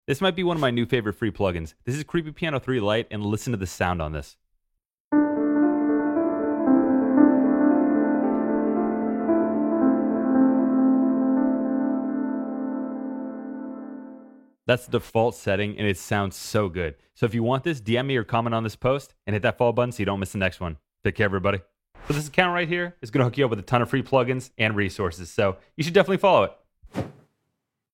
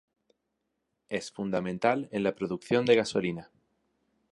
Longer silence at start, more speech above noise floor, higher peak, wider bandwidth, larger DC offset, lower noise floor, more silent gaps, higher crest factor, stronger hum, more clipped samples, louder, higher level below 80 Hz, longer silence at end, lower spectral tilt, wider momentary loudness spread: second, 0.1 s vs 1.1 s; about the same, 55 dB vs 53 dB; first, -2 dBFS vs -10 dBFS; first, 15.5 kHz vs 11.5 kHz; neither; about the same, -79 dBFS vs -81 dBFS; first, 4.93-5.11 s vs none; about the same, 20 dB vs 22 dB; neither; neither; first, -24 LUFS vs -29 LUFS; first, -50 dBFS vs -66 dBFS; about the same, 0.85 s vs 0.9 s; about the same, -6.5 dB/octave vs -5.5 dB/octave; about the same, 11 LU vs 12 LU